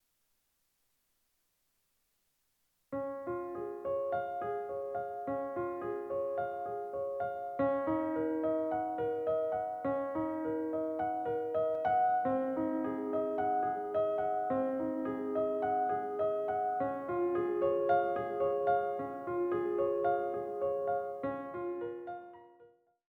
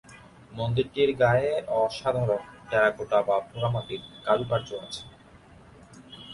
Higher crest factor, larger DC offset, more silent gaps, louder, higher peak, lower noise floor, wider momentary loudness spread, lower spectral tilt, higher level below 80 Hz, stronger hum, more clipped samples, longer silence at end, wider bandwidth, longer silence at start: about the same, 16 dB vs 18 dB; neither; neither; second, -34 LUFS vs -26 LUFS; second, -18 dBFS vs -8 dBFS; first, -78 dBFS vs -52 dBFS; second, 8 LU vs 16 LU; first, -8.5 dB/octave vs -6 dB/octave; second, -72 dBFS vs -56 dBFS; neither; neither; first, 0.45 s vs 0 s; second, 4.6 kHz vs 11.5 kHz; first, 2.9 s vs 0.1 s